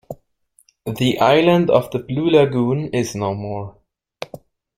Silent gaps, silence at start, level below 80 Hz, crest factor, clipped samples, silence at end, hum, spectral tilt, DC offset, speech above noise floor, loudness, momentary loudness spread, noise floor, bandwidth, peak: none; 0.1 s; -54 dBFS; 18 dB; under 0.1%; 0.5 s; none; -6.5 dB/octave; under 0.1%; 42 dB; -17 LUFS; 21 LU; -59 dBFS; 16.5 kHz; 0 dBFS